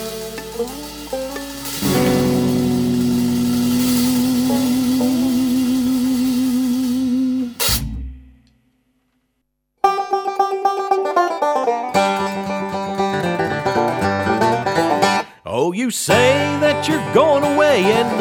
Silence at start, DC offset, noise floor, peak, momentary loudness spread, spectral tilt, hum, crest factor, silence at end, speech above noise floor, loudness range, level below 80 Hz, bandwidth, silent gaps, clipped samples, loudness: 0 s; under 0.1%; -71 dBFS; -2 dBFS; 11 LU; -4.5 dB/octave; none; 16 dB; 0 s; 55 dB; 6 LU; -42 dBFS; over 20 kHz; none; under 0.1%; -18 LUFS